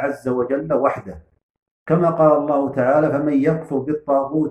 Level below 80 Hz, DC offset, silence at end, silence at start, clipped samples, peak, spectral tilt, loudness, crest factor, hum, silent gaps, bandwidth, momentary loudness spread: -54 dBFS; under 0.1%; 0 s; 0 s; under 0.1%; -2 dBFS; -9.5 dB/octave; -19 LUFS; 16 dB; none; 1.43-1.54 s, 1.62-1.86 s; 10.5 kHz; 8 LU